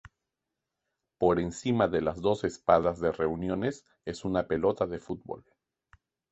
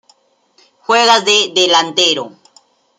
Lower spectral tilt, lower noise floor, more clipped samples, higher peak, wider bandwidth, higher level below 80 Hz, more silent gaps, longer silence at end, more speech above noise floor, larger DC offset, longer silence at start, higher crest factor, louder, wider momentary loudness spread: first, -6.5 dB/octave vs -1 dB/octave; first, -87 dBFS vs -55 dBFS; neither; second, -8 dBFS vs 0 dBFS; second, 8.4 kHz vs 16 kHz; first, -54 dBFS vs -68 dBFS; neither; first, 0.9 s vs 0.7 s; first, 58 dB vs 43 dB; neither; first, 1.2 s vs 0.9 s; first, 22 dB vs 16 dB; second, -29 LUFS vs -11 LUFS; about the same, 14 LU vs 13 LU